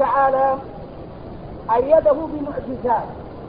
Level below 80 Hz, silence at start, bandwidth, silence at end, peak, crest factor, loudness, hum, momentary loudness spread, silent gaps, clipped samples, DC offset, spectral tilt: -42 dBFS; 0 s; 5.2 kHz; 0 s; -4 dBFS; 18 dB; -19 LUFS; none; 20 LU; none; under 0.1%; 0.2%; -11.5 dB/octave